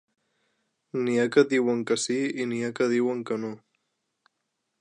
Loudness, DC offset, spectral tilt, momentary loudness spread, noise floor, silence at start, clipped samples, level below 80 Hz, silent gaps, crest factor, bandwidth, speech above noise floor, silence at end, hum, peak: -26 LUFS; under 0.1%; -4.5 dB/octave; 11 LU; -80 dBFS; 0.95 s; under 0.1%; -80 dBFS; none; 20 dB; 11 kHz; 55 dB; 1.25 s; none; -8 dBFS